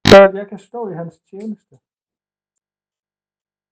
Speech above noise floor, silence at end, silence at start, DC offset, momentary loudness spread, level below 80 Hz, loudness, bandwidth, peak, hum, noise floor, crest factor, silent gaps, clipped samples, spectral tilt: over 76 dB; 2.15 s; 0.05 s; under 0.1%; 25 LU; -40 dBFS; -8 LUFS; 9.6 kHz; 0 dBFS; none; under -90 dBFS; 16 dB; none; 0.5%; -5 dB/octave